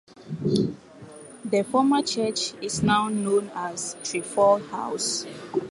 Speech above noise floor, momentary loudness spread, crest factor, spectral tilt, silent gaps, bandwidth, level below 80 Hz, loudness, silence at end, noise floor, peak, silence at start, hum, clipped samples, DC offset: 20 dB; 15 LU; 18 dB; -4 dB/octave; none; 11.5 kHz; -58 dBFS; -25 LUFS; 0 s; -45 dBFS; -8 dBFS; 0.1 s; none; under 0.1%; under 0.1%